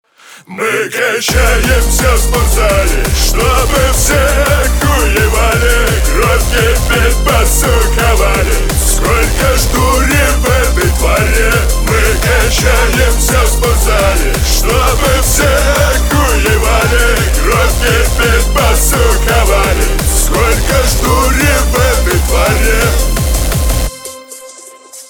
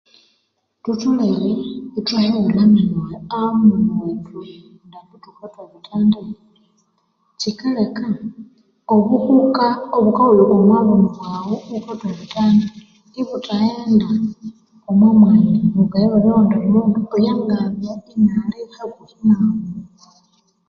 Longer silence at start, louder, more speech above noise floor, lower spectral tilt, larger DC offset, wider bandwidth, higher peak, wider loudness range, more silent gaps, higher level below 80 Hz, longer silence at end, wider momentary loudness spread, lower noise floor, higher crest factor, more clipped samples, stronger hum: second, 0.3 s vs 0.85 s; first, -11 LUFS vs -16 LUFS; second, 25 dB vs 52 dB; second, -3.5 dB/octave vs -8 dB/octave; neither; first, over 20 kHz vs 6.8 kHz; about the same, 0 dBFS vs -2 dBFS; second, 1 LU vs 9 LU; neither; first, -12 dBFS vs -54 dBFS; second, 0.05 s vs 0.85 s; second, 3 LU vs 16 LU; second, -35 dBFS vs -68 dBFS; about the same, 10 dB vs 14 dB; neither; neither